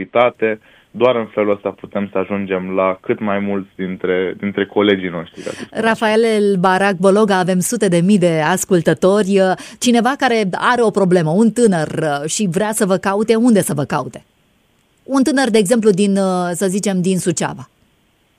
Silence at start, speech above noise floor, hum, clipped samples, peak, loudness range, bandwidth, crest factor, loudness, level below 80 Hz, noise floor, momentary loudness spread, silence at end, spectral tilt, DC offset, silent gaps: 0 s; 43 dB; none; under 0.1%; 0 dBFS; 5 LU; 15.5 kHz; 16 dB; -16 LUFS; -58 dBFS; -58 dBFS; 9 LU; 0.75 s; -5 dB/octave; under 0.1%; none